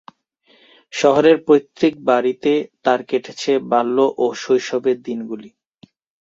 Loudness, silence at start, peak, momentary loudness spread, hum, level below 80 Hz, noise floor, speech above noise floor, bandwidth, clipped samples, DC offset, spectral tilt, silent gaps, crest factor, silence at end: -18 LUFS; 0.95 s; -2 dBFS; 11 LU; none; -64 dBFS; -57 dBFS; 40 dB; 7.8 kHz; under 0.1%; under 0.1%; -5 dB/octave; none; 16 dB; 0.7 s